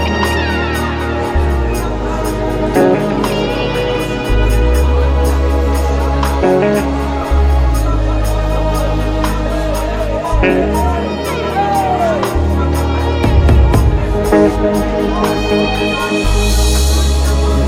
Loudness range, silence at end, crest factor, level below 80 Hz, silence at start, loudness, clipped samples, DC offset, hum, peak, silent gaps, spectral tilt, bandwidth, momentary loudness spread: 3 LU; 0 s; 12 dB; -16 dBFS; 0 s; -14 LUFS; under 0.1%; under 0.1%; none; 0 dBFS; none; -6 dB/octave; 15.5 kHz; 5 LU